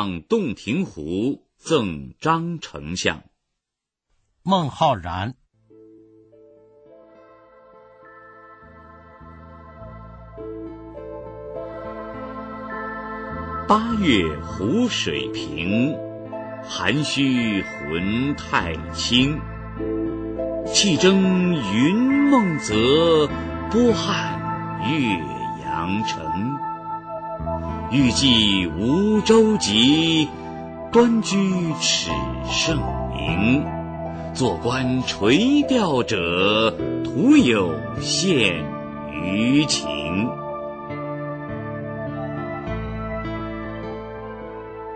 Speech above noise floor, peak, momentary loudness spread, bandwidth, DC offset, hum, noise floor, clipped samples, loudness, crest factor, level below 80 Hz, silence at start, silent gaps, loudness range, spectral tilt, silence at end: 65 dB; -4 dBFS; 17 LU; 9.2 kHz; under 0.1%; none; -85 dBFS; under 0.1%; -21 LUFS; 18 dB; -42 dBFS; 0 s; none; 12 LU; -4.5 dB/octave; 0 s